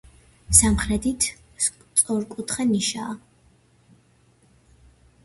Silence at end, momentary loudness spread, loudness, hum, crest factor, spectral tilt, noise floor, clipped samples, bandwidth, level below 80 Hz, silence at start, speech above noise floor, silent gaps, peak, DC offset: 2.05 s; 13 LU; -21 LUFS; none; 24 dB; -3 dB/octave; -59 dBFS; under 0.1%; 12 kHz; -38 dBFS; 0.5 s; 37 dB; none; -2 dBFS; under 0.1%